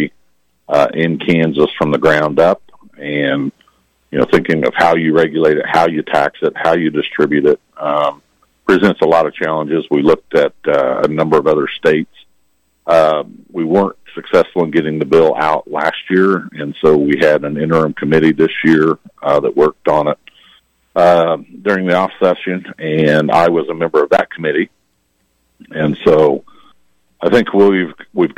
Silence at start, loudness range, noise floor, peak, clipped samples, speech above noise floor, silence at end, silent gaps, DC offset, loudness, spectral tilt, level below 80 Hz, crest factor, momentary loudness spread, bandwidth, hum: 0 s; 2 LU; -62 dBFS; 0 dBFS; under 0.1%; 49 dB; 0.05 s; none; under 0.1%; -14 LUFS; -7 dB/octave; -50 dBFS; 12 dB; 9 LU; 12 kHz; none